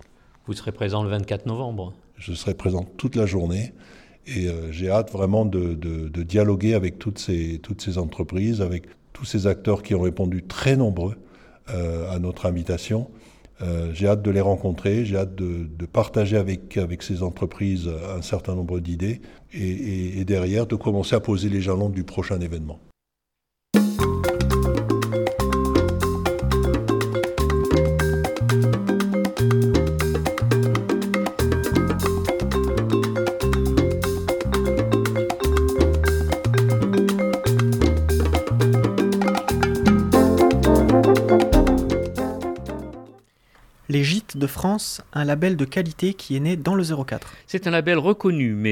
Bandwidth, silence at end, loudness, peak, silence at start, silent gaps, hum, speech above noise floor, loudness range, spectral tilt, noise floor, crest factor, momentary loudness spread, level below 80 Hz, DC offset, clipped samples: 19 kHz; 0 s; -22 LUFS; -4 dBFS; 0.45 s; none; none; 59 dB; 7 LU; -6.5 dB/octave; -83 dBFS; 18 dB; 10 LU; -32 dBFS; under 0.1%; under 0.1%